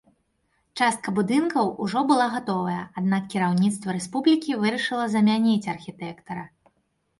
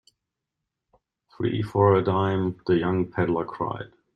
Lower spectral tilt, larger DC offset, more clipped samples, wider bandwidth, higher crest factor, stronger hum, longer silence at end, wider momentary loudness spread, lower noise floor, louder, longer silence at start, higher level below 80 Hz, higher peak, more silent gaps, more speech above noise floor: second, -5.5 dB/octave vs -9 dB/octave; neither; neither; first, 11.5 kHz vs 6.4 kHz; about the same, 16 dB vs 20 dB; neither; first, 0.75 s vs 0.3 s; about the same, 13 LU vs 11 LU; second, -71 dBFS vs -84 dBFS; about the same, -24 LUFS vs -24 LUFS; second, 0.75 s vs 1.4 s; second, -66 dBFS vs -58 dBFS; about the same, -8 dBFS vs -6 dBFS; neither; second, 47 dB vs 61 dB